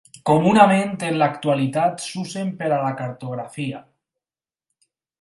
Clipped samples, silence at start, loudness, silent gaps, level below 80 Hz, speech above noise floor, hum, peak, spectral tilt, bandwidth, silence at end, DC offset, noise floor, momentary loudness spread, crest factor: under 0.1%; 0.15 s; -20 LUFS; none; -62 dBFS; over 70 dB; none; 0 dBFS; -6 dB/octave; 11.5 kHz; 1.4 s; under 0.1%; under -90 dBFS; 16 LU; 20 dB